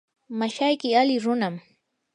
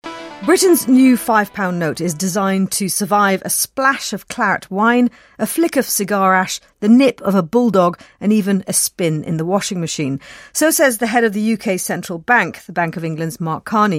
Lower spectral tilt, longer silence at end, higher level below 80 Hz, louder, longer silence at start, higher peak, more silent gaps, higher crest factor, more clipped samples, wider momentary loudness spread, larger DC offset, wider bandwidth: about the same, -5 dB/octave vs -4.5 dB/octave; first, 0.55 s vs 0 s; second, -80 dBFS vs -58 dBFS; second, -23 LUFS vs -16 LUFS; first, 0.3 s vs 0.05 s; second, -8 dBFS vs -2 dBFS; neither; about the same, 18 dB vs 14 dB; neither; about the same, 12 LU vs 10 LU; neither; second, 10 kHz vs 16.5 kHz